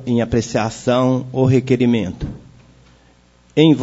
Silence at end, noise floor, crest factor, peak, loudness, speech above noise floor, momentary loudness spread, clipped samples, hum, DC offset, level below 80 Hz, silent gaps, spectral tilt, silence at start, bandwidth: 0 s; -52 dBFS; 16 dB; -2 dBFS; -17 LUFS; 36 dB; 9 LU; under 0.1%; 60 Hz at -40 dBFS; under 0.1%; -42 dBFS; none; -7 dB/octave; 0 s; 8 kHz